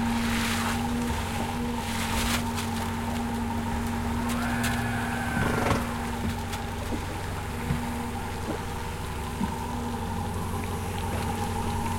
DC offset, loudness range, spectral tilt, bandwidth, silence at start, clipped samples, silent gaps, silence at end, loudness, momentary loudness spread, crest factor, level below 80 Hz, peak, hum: under 0.1%; 4 LU; -5 dB/octave; 16.5 kHz; 0 s; under 0.1%; none; 0 s; -30 LUFS; 6 LU; 18 dB; -38 dBFS; -12 dBFS; none